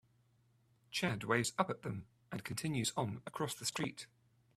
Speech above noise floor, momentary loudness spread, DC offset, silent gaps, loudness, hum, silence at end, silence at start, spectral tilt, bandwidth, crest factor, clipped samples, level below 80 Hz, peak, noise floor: 34 dB; 13 LU; under 0.1%; none; -39 LUFS; none; 0.5 s; 0.9 s; -4 dB/octave; 15.5 kHz; 24 dB; under 0.1%; -72 dBFS; -16 dBFS; -73 dBFS